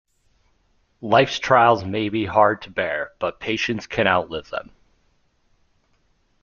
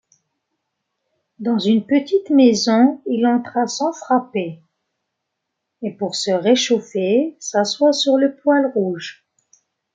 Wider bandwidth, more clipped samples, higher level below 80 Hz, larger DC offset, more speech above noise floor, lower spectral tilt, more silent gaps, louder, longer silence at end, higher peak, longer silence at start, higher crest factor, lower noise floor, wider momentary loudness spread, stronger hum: second, 7.2 kHz vs 9.2 kHz; neither; first, -56 dBFS vs -70 dBFS; neither; second, 44 dB vs 61 dB; about the same, -5 dB/octave vs -4.5 dB/octave; neither; about the same, -20 LUFS vs -18 LUFS; first, 1.8 s vs 0.85 s; about the same, -2 dBFS vs -2 dBFS; second, 1 s vs 1.4 s; about the same, 22 dB vs 18 dB; second, -64 dBFS vs -78 dBFS; about the same, 13 LU vs 12 LU; neither